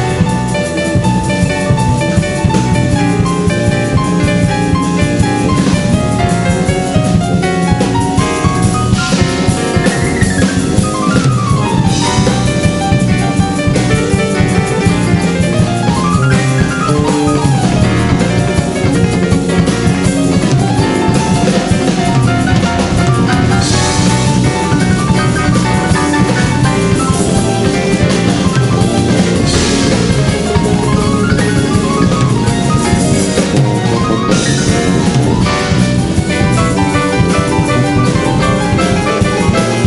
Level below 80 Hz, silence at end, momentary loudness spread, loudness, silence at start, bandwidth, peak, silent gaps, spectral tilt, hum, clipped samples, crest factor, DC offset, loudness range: -26 dBFS; 0 s; 2 LU; -12 LUFS; 0 s; 11.5 kHz; 0 dBFS; none; -5.5 dB/octave; none; under 0.1%; 10 dB; under 0.1%; 1 LU